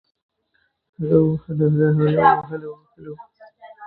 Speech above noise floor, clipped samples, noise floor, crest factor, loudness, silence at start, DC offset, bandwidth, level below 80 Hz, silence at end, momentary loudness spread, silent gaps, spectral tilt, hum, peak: 49 dB; under 0.1%; -68 dBFS; 20 dB; -18 LUFS; 1 s; under 0.1%; 4.2 kHz; -54 dBFS; 0 s; 23 LU; none; -12.5 dB/octave; none; 0 dBFS